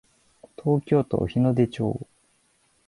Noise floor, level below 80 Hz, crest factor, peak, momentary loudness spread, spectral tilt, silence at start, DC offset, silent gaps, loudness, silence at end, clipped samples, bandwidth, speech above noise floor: -66 dBFS; -52 dBFS; 18 dB; -8 dBFS; 11 LU; -9 dB/octave; 0.6 s; under 0.1%; none; -24 LUFS; 0.85 s; under 0.1%; 11.5 kHz; 43 dB